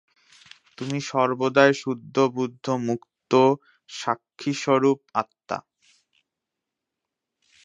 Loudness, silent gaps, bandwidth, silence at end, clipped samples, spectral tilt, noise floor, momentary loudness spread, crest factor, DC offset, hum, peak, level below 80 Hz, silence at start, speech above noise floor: -24 LUFS; none; 8.2 kHz; 2.05 s; under 0.1%; -5.5 dB/octave; -85 dBFS; 13 LU; 24 dB; under 0.1%; none; -2 dBFS; -74 dBFS; 0.8 s; 62 dB